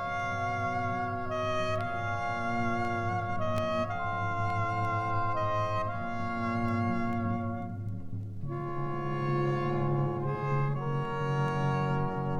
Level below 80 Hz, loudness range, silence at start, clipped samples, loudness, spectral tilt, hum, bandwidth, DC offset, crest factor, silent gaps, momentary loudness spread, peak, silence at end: -50 dBFS; 2 LU; 0 s; under 0.1%; -32 LUFS; -7.5 dB/octave; none; 9.6 kHz; under 0.1%; 12 dB; none; 5 LU; -18 dBFS; 0 s